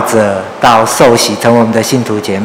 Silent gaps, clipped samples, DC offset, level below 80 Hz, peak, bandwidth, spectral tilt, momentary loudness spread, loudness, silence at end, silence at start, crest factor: none; 4%; under 0.1%; -42 dBFS; 0 dBFS; 18 kHz; -4 dB/octave; 6 LU; -9 LUFS; 0 s; 0 s; 8 dB